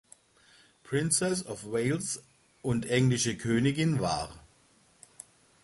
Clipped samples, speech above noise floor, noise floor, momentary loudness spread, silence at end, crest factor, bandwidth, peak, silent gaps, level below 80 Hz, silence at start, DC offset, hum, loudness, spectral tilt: under 0.1%; 35 dB; -64 dBFS; 16 LU; 1.25 s; 20 dB; 11.5 kHz; -12 dBFS; none; -58 dBFS; 0.85 s; under 0.1%; none; -29 LUFS; -4.5 dB/octave